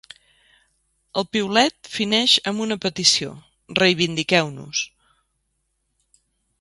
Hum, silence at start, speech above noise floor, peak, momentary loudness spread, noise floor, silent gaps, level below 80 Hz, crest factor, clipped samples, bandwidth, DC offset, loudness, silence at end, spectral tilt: none; 1.15 s; 52 dB; -2 dBFS; 10 LU; -73 dBFS; none; -60 dBFS; 22 dB; under 0.1%; 11.5 kHz; under 0.1%; -20 LUFS; 1.75 s; -3 dB/octave